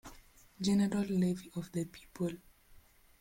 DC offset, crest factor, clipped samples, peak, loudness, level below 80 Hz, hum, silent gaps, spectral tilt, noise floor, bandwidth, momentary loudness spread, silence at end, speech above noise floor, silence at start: under 0.1%; 16 dB; under 0.1%; -22 dBFS; -35 LUFS; -62 dBFS; none; none; -6.5 dB/octave; -61 dBFS; 16.5 kHz; 13 LU; 0.85 s; 27 dB; 0.05 s